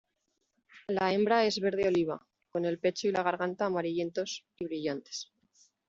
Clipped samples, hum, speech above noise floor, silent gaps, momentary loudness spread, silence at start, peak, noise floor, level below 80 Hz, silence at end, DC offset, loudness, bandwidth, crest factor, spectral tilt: under 0.1%; none; 50 dB; none; 13 LU; 0.75 s; -14 dBFS; -80 dBFS; -70 dBFS; 0.65 s; under 0.1%; -31 LUFS; 7.8 kHz; 18 dB; -5 dB/octave